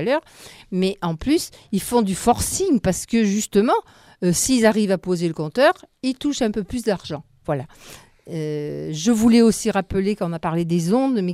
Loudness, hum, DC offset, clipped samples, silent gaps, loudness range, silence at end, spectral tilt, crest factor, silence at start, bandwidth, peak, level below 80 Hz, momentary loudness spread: -21 LUFS; none; under 0.1%; under 0.1%; none; 4 LU; 0 s; -5 dB/octave; 18 dB; 0 s; 16 kHz; -2 dBFS; -46 dBFS; 11 LU